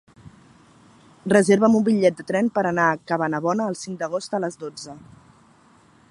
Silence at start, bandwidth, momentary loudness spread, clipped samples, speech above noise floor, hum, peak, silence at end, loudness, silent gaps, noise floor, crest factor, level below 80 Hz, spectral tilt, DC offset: 1.25 s; 11.5 kHz; 18 LU; under 0.1%; 34 dB; none; -2 dBFS; 1.1 s; -21 LUFS; none; -55 dBFS; 20 dB; -64 dBFS; -6 dB/octave; under 0.1%